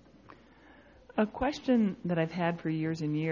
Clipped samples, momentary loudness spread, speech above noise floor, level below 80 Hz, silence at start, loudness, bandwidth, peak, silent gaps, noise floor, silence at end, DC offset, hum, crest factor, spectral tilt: under 0.1%; 5 LU; 27 dB; -58 dBFS; 0.3 s; -31 LUFS; 7.4 kHz; -16 dBFS; none; -57 dBFS; 0 s; under 0.1%; none; 16 dB; -7.5 dB/octave